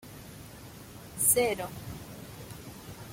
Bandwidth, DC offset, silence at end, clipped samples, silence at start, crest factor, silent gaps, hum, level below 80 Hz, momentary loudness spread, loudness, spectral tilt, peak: 16.5 kHz; under 0.1%; 0 s; under 0.1%; 0 s; 24 dB; none; none; -58 dBFS; 23 LU; -26 LUFS; -2.5 dB/octave; -10 dBFS